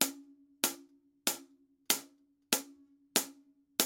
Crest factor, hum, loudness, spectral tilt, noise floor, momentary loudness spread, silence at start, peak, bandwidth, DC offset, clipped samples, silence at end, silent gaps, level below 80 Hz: 32 dB; none; -34 LUFS; 0 dB/octave; -63 dBFS; 15 LU; 0 s; -6 dBFS; 17 kHz; under 0.1%; under 0.1%; 0 s; none; -88 dBFS